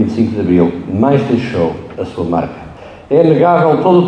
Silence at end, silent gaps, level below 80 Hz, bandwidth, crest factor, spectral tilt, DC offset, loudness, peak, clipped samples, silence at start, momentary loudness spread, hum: 0 s; none; -44 dBFS; 9 kHz; 12 dB; -9 dB/octave; under 0.1%; -13 LUFS; 0 dBFS; under 0.1%; 0 s; 14 LU; none